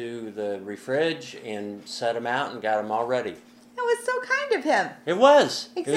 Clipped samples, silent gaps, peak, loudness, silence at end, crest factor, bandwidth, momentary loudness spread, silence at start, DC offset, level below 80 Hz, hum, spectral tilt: under 0.1%; none; -2 dBFS; -25 LUFS; 0 s; 22 dB; 13.5 kHz; 16 LU; 0 s; under 0.1%; -76 dBFS; none; -4 dB/octave